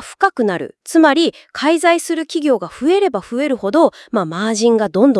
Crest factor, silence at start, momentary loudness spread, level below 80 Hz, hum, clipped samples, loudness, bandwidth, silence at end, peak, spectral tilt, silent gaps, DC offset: 16 dB; 0 s; 7 LU; -60 dBFS; none; under 0.1%; -16 LUFS; 12 kHz; 0 s; 0 dBFS; -4.5 dB/octave; none; under 0.1%